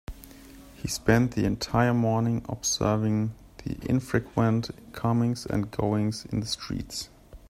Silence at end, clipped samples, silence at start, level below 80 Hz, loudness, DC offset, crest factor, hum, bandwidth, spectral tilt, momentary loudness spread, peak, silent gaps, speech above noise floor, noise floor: 0.05 s; under 0.1%; 0.1 s; -48 dBFS; -27 LUFS; under 0.1%; 22 dB; none; 15.5 kHz; -5.5 dB/octave; 14 LU; -6 dBFS; none; 22 dB; -48 dBFS